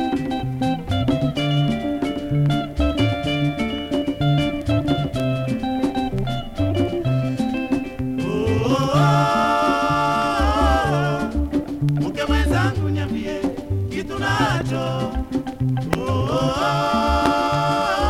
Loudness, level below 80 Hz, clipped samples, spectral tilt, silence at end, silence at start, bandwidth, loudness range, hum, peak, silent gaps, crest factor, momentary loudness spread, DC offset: -21 LUFS; -32 dBFS; under 0.1%; -6.5 dB/octave; 0 s; 0 s; 15 kHz; 4 LU; none; 0 dBFS; none; 20 dB; 7 LU; under 0.1%